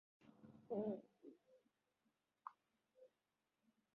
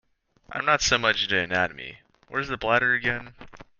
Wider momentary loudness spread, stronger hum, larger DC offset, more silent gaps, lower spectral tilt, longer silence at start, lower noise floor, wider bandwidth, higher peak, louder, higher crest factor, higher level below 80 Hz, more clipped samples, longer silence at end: first, 20 LU vs 13 LU; neither; neither; neither; first, -9 dB/octave vs -2.5 dB/octave; second, 0.2 s vs 0.5 s; first, under -90 dBFS vs -51 dBFS; second, 5.6 kHz vs 10 kHz; second, -34 dBFS vs -4 dBFS; second, -50 LUFS vs -24 LUFS; about the same, 20 dB vs 22 dB; second, under -90 dBFS vs -52 dBFS; neither; first, 0.9 s vs 0.15 s